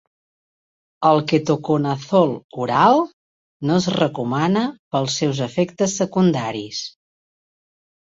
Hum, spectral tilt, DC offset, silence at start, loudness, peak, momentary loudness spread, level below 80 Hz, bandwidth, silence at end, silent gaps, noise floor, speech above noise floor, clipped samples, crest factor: none; -5.5 dB/octave; under 0.1%; 1 s; -20 LUFS; -2 dBFS; 11 LU; -60 dBFS; 8 kHz; 1.3 s; 2.44-2.49 s, 3.13-3.60 s, 4.79-4.91 s; under -90 dBFS; over 71 dB; under 0.1%; 18 dB